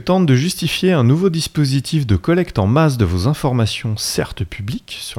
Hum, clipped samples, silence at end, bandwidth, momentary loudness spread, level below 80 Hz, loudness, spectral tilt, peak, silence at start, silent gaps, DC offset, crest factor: none; under 0.1%; 0 s; 16.5 kHz; 11 LU; -38 dBFS; -17 LUFS; -6 dB/octave; 0 dBFS; 0 s; none; under 0.1%; 16 dB